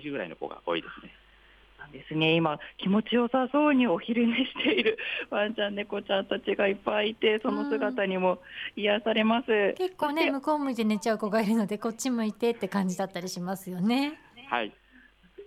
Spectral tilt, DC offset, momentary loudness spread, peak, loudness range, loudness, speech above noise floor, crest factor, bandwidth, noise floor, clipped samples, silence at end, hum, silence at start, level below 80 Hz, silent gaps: -5 dB/octave; under 0.1%; 10 LU; -12 dBFS; 4 LU; -28 LUFS; 30 dB; 16 dB; 15 kHz; -58 dBFS; under 0.1%; 0 s; none; 0 s; -66 dBFS; none